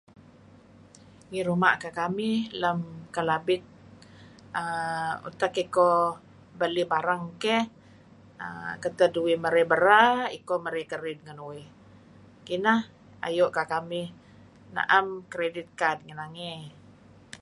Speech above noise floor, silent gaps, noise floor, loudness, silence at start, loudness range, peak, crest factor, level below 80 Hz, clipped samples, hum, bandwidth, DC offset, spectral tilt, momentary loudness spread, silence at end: 27 dB; none; -53 dBFS; -27 LUFS; 1.3 s; 6 LU; -4 dBFS; 24 dB; -66 dBFS; under 0.1%; 50 Hz at -60 dBFS; 11.5 kHz; under 0.1%; -5 dB/octave; 16 LU; 0.05 s